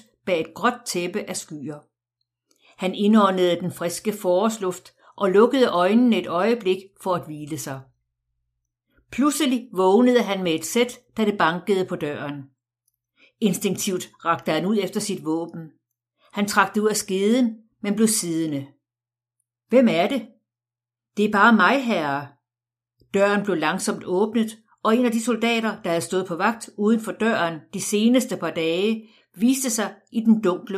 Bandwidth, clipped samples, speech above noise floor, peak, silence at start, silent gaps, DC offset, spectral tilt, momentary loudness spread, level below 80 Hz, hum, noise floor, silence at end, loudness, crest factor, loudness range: 15.5 kHz; under 0.1%; over 69 dB; -2 dBFS; 0.25 s; none; under 0.1%; -4.5 dB/octave; 12 LU; -68 dBFS; none; under -90 dBFS; 0 s; -22 LUFS; 20 dB; 5 LU